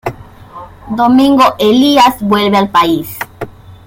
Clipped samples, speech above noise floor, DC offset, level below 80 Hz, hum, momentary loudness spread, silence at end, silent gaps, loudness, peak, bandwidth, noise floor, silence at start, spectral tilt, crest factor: under 0.1%; 23 dB; under 0.1%; -42 dBFS; none; 16 LU; 0.15 s; none; -9 LUFS; 0 dBFS; 17 kHz; -32 dBFS; 0.05 s; -5 dB/octave; 12 dB